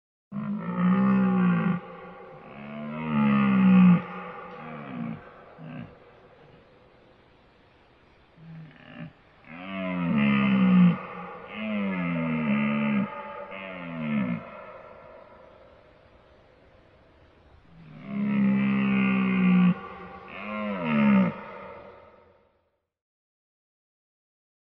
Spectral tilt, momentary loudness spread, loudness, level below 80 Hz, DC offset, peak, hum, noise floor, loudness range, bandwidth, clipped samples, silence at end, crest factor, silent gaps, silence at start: -10.5 dB/octave; 24 LU; -25 LUFS; -60 dBFS; under 0.1%; -10 dBFS; none; -73 dBFS; 16 LU; 3.9 kHz; under 0.1%; 2.8 s; 18 dB; none; 0.3 s